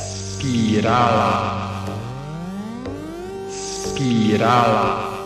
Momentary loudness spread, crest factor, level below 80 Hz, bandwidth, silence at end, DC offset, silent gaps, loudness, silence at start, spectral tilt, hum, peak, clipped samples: 15 LU; 18 dB; -46 dBFS; 13.5 kHz; 0 s; under 0.1%; none; -20 LUFS; 0 s; -5.5 dB/octave; none; -2 dBFS; under 0.1%